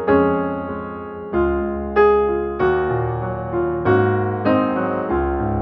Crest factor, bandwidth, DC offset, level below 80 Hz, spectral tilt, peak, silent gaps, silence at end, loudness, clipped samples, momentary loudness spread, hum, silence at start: 14 dB; 5.4 kHz; under 0.1%; -36 dBFS; -10.5 dB/octave; -4 dBFS; none; 0 s; -19 LUFS; under 0.1%; 9 LU; none; 0 s